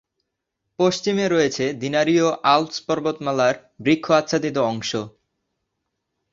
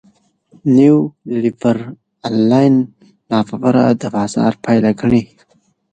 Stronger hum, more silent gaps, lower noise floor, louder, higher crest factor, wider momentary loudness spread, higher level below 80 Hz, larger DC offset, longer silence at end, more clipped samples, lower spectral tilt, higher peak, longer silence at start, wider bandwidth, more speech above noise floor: neither; neither; first, -79 dBFS vs -58 dBFS; second, -21 LUFS vs -15 LUFS; about the same, 18 dB vs 14 dB; second, 7 LU vs 11 LU; second, -62 dBFS vs -50 dBFS; neither; first, 1.25 s vs 0.7 s; neither; second, -4.5 dB/octave vs -7.5 dB/octave; about the same, -2 dBFS vs 0 dBFS; first, 0.8 s vs 0.65 s; second, 7.8 kHz vs 9.2 kHz; first, 58 dB vs 44 dB